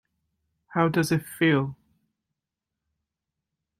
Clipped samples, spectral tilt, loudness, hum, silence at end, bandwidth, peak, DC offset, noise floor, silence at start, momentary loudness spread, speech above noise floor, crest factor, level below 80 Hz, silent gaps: under 0.1%; -6 dB/octave; -25 LUFS; none; 2.05 s; 16 kHz; -8 dBFS; under 0.1%; -87 dBFS; 0.7 s; 8 LU; 63 dB; 22 dB; -66 dBFS; none